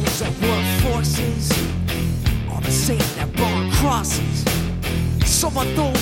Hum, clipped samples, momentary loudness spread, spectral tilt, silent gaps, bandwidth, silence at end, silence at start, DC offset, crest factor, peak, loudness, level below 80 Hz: none; under 0.1%; 5 LU; -4.5 dB/octave; none; 17 kHz; 0 s; 0 s; under 0.1%; 14 dB; -4 dBFS; -20 LUFS; -28 dBFS